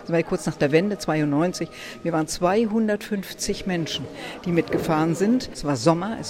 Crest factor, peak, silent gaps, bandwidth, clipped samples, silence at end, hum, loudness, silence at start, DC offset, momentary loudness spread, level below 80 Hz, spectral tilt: 18 dB; -4 dBFS; none; 16.5 kHz; under 0.1%; 0 s; none; -24 LUFS; 0 s; under 0.1%; 9 LU; -50 dBFS; -5.5 dB/octave